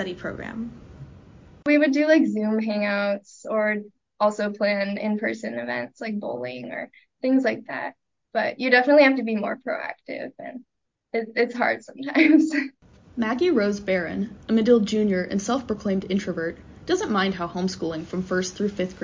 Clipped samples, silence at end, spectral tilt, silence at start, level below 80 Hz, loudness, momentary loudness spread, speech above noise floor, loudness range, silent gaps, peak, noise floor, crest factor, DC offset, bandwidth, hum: under 0.1%; 0 s; -5.5 dB/octave; 0 s; -56 dBFS; -23 LUFS; 15 LU; 25 dB; 5 LU; none; -4 dBFS; -48 dBFS; 20 dB; under 0.1%; 7.6 kHz; none